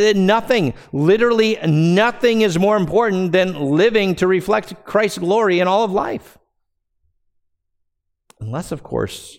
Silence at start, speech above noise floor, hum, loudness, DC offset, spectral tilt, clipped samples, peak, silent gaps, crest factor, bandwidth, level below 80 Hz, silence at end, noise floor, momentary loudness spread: 0 s; 55 dB; none; -17 LUFS; under 0.1%; -6 dB/octave; under 0.1%; 0 dBFS; none; 16 dB; 16 kHz; -50 dBFS; 0.05 s; -72 dBFS; 11 LU